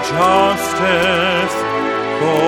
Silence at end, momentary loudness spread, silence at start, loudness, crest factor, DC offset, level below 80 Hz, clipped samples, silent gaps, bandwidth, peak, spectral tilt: 0 s; 6 LU; 0 s; -15 LUFS; 14 dB; under 0.1%; -46 dBFS; under 0.1%; none; 17.5 kHz; -2 dBFS; -4 dB/octave